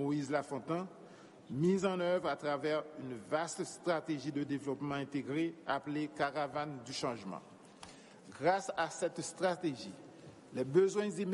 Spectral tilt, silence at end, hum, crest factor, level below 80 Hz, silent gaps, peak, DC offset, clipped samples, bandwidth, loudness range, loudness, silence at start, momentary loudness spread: -5.5 dB/octave; 0 s; none; 20 dB; -76 dBFS; none; -18 dBFS; under 0.1%; under 0.1%; 11.5 kHz; 3 LU; -37 LUFS; 0 s; 20 LU